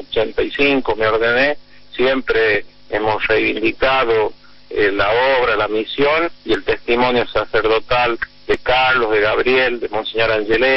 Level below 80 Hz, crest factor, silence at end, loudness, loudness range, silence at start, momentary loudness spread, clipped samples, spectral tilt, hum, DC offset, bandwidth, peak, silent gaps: -38 dBFS; 14 dB; 0 s; -16 LUFS; 1 LU; 0 s; 6 LU; under 0.1%; -6.5 dB/octave; none; under 0.1%; 6 kHz; -4 dBFS; none